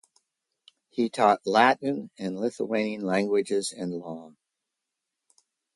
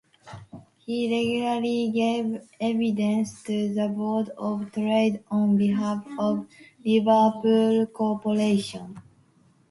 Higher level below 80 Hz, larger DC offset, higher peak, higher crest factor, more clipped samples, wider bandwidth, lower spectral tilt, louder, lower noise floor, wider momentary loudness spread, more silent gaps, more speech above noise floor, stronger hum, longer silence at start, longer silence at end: second, -74 dBFS vs -66 dBFS; neither; about the same, -6 dBFS vs -8 dBFS; first, 22 dB vs 16 dB; neither; about the same, 11.5 kHz vs 11.5 kHz; second, -4.5 dB/octave vs -6.5 dB/octave; about the same, -26 LUFS vs -25 LUFS; first, -85 dBFS vs -60 dBFS; first, 15 LU vs 12 LU; neither; first, 59 dB vs 37 dB; neither; first, 0.95 s vs 0.25 s; first, 1.5 s vs 0.7 s